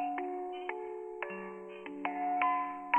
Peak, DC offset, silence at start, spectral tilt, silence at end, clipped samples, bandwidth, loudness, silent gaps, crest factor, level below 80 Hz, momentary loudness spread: -14 dBFS; under 0.1%; 0 s; -6.5 dB/octave; 0 s; under 0.1%; 8.4 kHz; -37 LUFS; none; 22 dB; -78 dBFS; 13 LU